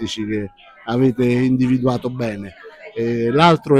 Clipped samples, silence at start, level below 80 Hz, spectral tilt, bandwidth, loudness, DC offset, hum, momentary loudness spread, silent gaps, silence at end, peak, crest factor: under 0.1%; 0 s; -48 dBFS; -7 dB/octave; 10 kHz; -18 LUFS; under 0.1%; none; 19 LU; none; 0 s; 0 dBFS; 18 dB